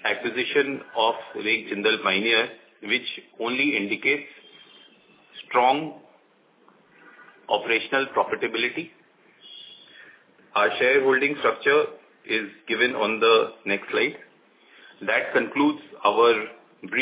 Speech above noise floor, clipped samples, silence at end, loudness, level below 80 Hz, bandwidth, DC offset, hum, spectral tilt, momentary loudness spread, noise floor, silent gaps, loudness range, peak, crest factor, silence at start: 37 dB; under 0.1%; 0 s; -23 LUFS; -74 dBFS; 4 kHz; under 0.1%; none; -7.5 dB/octave; 14 LU; -60 dBFS; none; 5 LU; -6 dBFS; 18 dB; 0.05 s